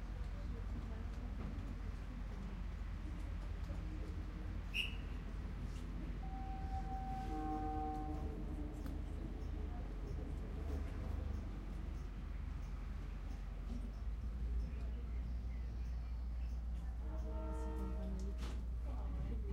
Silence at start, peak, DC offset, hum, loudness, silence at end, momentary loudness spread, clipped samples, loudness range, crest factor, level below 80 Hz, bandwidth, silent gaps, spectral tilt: 0 s; -26 dBFS; under 0.1%; none; -46 LUFS; 0 s; 5 LU; under 0.1%; 3 LU; 18 dB; -44 dBFS; 11.5 kHz; none; -7 dB/octave